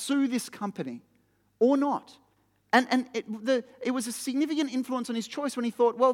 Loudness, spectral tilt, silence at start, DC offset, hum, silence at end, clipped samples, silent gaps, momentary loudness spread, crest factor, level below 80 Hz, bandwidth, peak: -28 LUFS; -4 dB/octave; 0 s; under 0.1%; none; 0 s; under 0.1%; none; 11 LU; 22 dB; -82 dBFS; 16.5 kHz; -6 dBFS